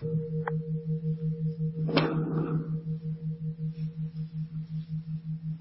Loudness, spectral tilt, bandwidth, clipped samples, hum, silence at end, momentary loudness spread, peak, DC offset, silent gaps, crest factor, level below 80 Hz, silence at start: -32 LUFS; -11.5 dB/octave; 5.8 kHz; under 0.1%; none; 0 s; 9 LU; -8 dBFS; under 0.1%; none; 24 dB; -60 dBFS; 0 s